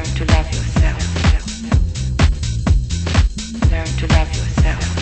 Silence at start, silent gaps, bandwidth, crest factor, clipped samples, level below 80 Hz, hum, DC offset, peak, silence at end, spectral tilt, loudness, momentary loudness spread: 0 s; none; 8.8 kHz; 14 dB; under 0.1%; -18 dBFS; none; under 0.1%; -2 dBFS; 0 s; -5.5 dB/octave; -18 LUFS; 4 LU